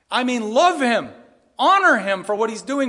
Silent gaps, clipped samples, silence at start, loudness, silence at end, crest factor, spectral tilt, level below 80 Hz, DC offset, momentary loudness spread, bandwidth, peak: none; under 0.1%; 0.1 s; -18 LUFS; 0 s; 16 dB; -3 dB/octave; -72 dBFS; under 0.1%; 8 LU; 11.5 kHz; -4 dBFS